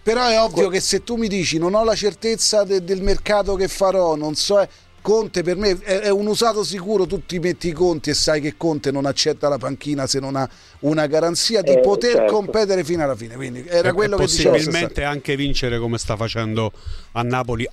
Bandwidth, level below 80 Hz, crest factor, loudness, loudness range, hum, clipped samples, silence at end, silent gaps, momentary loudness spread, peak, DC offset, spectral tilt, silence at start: 14 kHz; -36 dBFS; 16 dB; -19 LUFS; 2 LU; none; under 0.1%; 0 s; none; 8 LU; -2 dBFS; under 0.1%; -4 dB/octave; 0.05 s